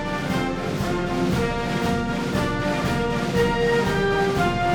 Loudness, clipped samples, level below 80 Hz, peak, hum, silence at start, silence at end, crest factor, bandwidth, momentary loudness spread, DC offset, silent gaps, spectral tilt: -23 LUFS; under 0.1%; -36 dBFS; -8 dBFS; none; 0 s; 0 s; 14 dB; over 20 kHz; 4 LU; under 0.1%; none; -6 dB/octave